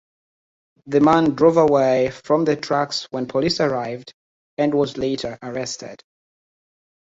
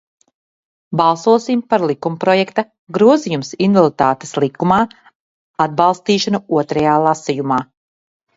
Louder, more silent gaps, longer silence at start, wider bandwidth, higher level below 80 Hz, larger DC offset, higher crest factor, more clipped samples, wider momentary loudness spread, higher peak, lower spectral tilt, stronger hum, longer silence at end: second, -20 LUFS vs -16 LUFS; about the same, 4.14-4.57 s vs 2.79-2.87 s, 5.15-5.54 s; about the same, 0.85 s vs 0.9 s; about the same, 8 kHz vs 8 kHz; about the same, -56 dBFS vs -56 dBFS; neither; about the same, 18 dB vs 16 dB; neither; first, 14 LU vs 8 LU; about the same, -2 dBFS vs 0 dBFS; about the same, -5.5 dB/octave vs -6 dB/octave; neither; first, 1.1 s vs 0.75 s